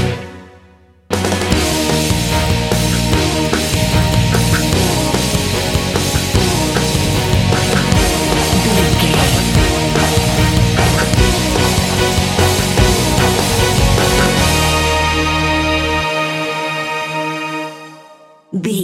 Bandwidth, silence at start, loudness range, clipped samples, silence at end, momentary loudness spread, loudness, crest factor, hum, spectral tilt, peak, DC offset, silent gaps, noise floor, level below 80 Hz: 16.5 kHz; 0 s; 3 LU; under 0.1%; 0 s; 6 LU; -14 LUFS; 14 dB; none; -4 dB/octave; 0 dBFS; under 0.1%; none; -46 dBFS; -24 dBFS